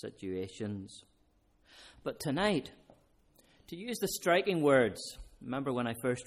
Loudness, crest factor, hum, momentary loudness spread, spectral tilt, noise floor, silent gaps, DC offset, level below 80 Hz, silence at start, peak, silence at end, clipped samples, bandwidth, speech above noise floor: -33 LUFS; 20 dB; none; 20 LU; -5 dB/octave; -70 dBFS; none; under 0.1%; -62 dBFS; 0.05 s; -14 dBFS; 0.05 s; under 0.1%; 15.5 kHz; 37 dB